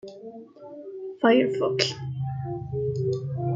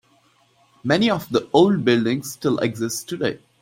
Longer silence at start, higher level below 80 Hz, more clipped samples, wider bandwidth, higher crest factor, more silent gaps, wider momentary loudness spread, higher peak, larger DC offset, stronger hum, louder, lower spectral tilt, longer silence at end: second, 0.05 s vs 0.85 s; about the same, -56 dBFS vs -60 dBFS; neither; second, 7.8 kHz vs 16.5 kHz; first, 24 dB vs 18 dB; neither; first, 22 LU vs 9 LU; about the same, -2 dBFS vs -2 dBFS; neither; neither; second, -25 LUFS vs -20 LUFS; about the same, -6 dB/octave vs -5 dB/octave; second, 0 s vs 0.25 s